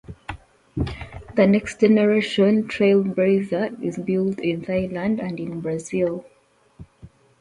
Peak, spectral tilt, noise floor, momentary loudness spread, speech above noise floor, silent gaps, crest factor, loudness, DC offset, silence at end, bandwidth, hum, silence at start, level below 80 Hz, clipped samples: -4 dBFS; -7 dB/octave; -52 dBFS; 16 LU; 32 dB; none; 18 dB; -21 LUFS; under 0.1%; 0.35 s; 11 kHz; none; 0.1 s; -46 dBFS; under 0.1%